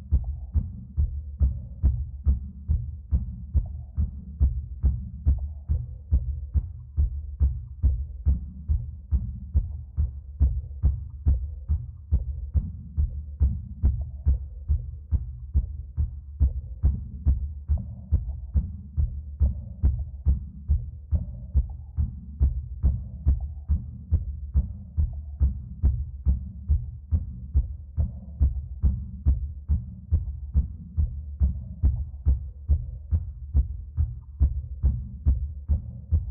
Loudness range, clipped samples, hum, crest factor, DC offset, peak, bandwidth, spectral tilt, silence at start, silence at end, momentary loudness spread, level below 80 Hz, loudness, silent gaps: 1 LU; under 0.1%; none; 16 dB; under 0.1%; -10 dBFS; 1.3 kHz; -15 dB/octave; 0 s; 0 s; 4 LU; -28 dBFS; -29 LUFS; none